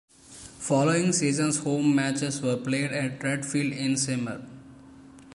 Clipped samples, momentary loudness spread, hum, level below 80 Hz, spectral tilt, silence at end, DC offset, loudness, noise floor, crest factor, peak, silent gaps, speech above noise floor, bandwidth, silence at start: under 0.1%; 13 LU; none; -64 dBFS; -4.5 dB/octave; 0 s; under 0.1%; -26 LUFS; -49 dBFS; 16 dB; -10 dBFS; none; 23 dB; 11.5 kHz; 0.3 s